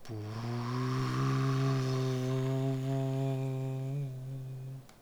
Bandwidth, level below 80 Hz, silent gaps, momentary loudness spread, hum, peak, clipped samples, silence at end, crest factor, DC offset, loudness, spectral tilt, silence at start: 12 kHz; -60 dBFS; none; 11 LU; none; -20 dBFS; under 0.1%; 0.1 s; 12 dB; under 0.1%; -34 LUFS; -7.5 dB/octave; 0 s